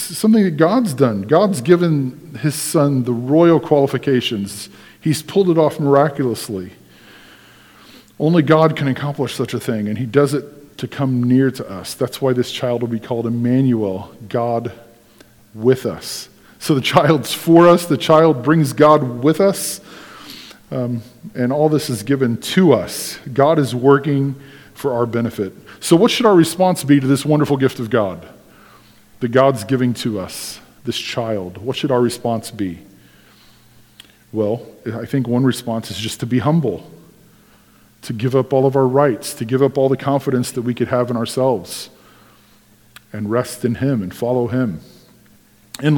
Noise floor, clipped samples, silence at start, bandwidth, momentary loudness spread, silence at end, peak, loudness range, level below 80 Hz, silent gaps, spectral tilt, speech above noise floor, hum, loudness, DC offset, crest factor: -50 dBFS; under 0.1%; 0 s; 19 kHz; 15 LU; 0 s; 0 dBFS; 8 LU; -56 dBFS; none; -6 dB/octave; 34 dB; none; -17 LUFS; under 0.1%; 18 dB